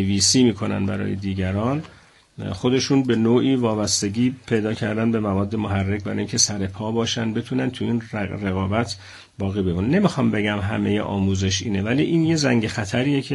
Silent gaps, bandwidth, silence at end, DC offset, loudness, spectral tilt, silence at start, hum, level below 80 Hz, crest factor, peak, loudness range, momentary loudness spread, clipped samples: none; 12 kHz; 0 s; under 0.1%; -21 LUFS; -4.5 dB/octave; 0 s; none; -52 dBFS; 18 dB; -2 dBFS; 3 LU; 7 LU; under 0.1%